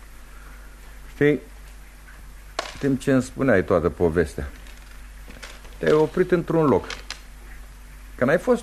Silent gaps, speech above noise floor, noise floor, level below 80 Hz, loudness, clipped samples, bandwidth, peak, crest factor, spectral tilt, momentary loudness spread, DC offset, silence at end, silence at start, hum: none; 22 dB; -42 dBFS; -40 dBFS; -22 LUFS; under 0.1%; 13.5 kHz; -6 dBFS; 18 dB; -6.5 dB/octave; 24 LU; under 0.1%; 0 s; 0.1 s; none